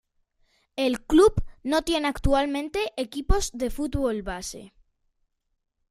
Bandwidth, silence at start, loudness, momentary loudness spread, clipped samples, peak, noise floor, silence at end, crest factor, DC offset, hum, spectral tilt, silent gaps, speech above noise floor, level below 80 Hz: 15 kHz; 0.75 s; -25 LUFS; 14 LU; under 0.1%; -6 dBFS; -73 dBFS; 1.25 s; 18 dB; under 0.1%; none; -5 dB/octave; none; 49 dB; -36 dBFS